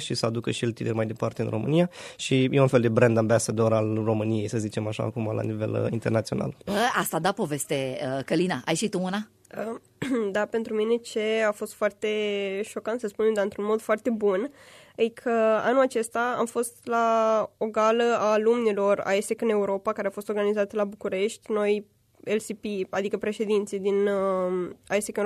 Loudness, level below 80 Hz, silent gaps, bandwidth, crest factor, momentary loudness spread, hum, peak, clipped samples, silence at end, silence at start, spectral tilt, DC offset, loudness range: -26 LUFS; -64 dBFS; none; 14 kHz; 20 dB; 8 LU; none; -6 dBFS; under 0.1%; 0 s; 0 s; -5.5 dB/octave; under 0.1%; 4 LU